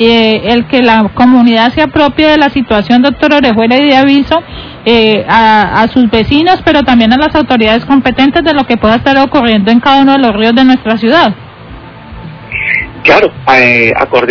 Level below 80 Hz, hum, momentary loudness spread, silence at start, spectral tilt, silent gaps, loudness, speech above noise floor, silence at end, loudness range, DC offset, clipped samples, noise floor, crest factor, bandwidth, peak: -32 dBFS; none; 5 LU; 0 s; -6.5 dB/octave; none; -7 LUFS; 22 dB; 0 s; 2 LU; under 0.1%; 5%; -28 dBFS; 8 dB; 5.4 kHz; 0 dBFS